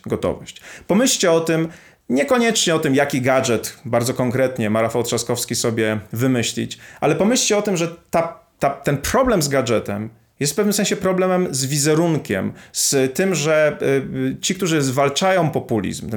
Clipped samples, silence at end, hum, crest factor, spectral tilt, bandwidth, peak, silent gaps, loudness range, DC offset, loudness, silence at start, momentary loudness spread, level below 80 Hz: under 0.1%; 0 s; none; 14 dB; -4 dB/octave; 19.5 kHz; -4 dBFS; none; 2 LU; under 0.1%; -19 LUFS; 0.05 s; 7 LU; -48 dBFS